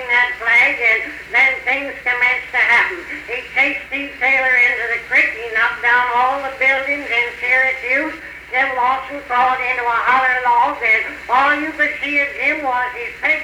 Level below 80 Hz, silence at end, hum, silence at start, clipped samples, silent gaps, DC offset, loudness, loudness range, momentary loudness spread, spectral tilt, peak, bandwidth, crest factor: -50 dBFS; 0 s; none; 0 s; under 0.1%; none; under 0.1%; -15 LUFS; 2 LU; 8 LU; -3 dB/octave; -4 dBFS; 18 kHz; 12 dB